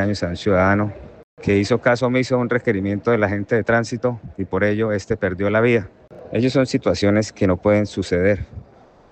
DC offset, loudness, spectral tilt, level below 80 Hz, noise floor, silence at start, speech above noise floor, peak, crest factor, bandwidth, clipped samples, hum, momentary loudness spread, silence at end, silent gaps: under 0.1%; -19 LUFS; -6.5 dB/octave; -48 dBFS; -47 dBFS; 0 s; 29 dB; -4 dBFS; 16 dB; 8.8 kHz; under 0.1%; none; 8 LU; 0.5 s; 1.23-1.37 s